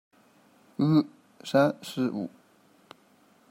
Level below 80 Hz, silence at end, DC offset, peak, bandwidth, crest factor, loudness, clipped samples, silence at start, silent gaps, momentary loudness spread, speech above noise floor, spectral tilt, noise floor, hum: -74 dBFS; 1.2 s; under 0.1%; -10 dBFS; 16 kHz; 20 dB; -27 LUFS; under 0.1%; 0.8 s; none; 17 LU; 36 dB; -7 dB/octave; -61 dBFS; none